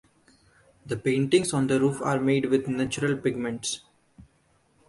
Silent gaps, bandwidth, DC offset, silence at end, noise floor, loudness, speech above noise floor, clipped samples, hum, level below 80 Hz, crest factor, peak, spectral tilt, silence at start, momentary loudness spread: none; 11.5 kHz; under 0.1%; 0.65 s; -65 dBFS; -26 LUFS; 40 dB; under 0.1%; none; -60 dBFS; 18 dB; -8 dBFS; -5.5 dB/octave; 0.85 s; 8 LU